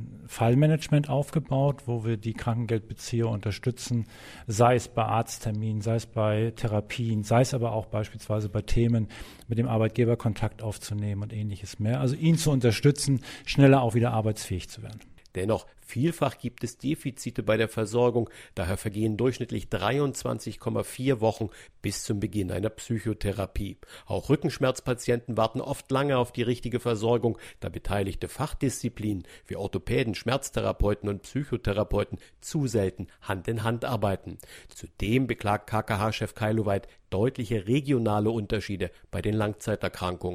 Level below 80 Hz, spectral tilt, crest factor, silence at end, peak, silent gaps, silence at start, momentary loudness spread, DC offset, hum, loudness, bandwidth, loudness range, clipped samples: -44 dBFS; -6.5 dB/octave; 22 dB; 0 s; -6 dBFS; none; 0 s; 11 LU; under 0.1%; none; -28 LUFS; 15.5 kHz; 5 LU; under 0.1%